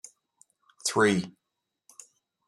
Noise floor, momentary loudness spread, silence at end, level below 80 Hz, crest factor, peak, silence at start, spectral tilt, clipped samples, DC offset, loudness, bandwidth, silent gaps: -84 dBFS; 27 LU; 1.2 s; -72 dBFS; 22 dB; -10 dBFS; 0.85 s; -4 dB/octave; under 0.1%; under 0.1%; -26 LUFS; 13.5 kHz; none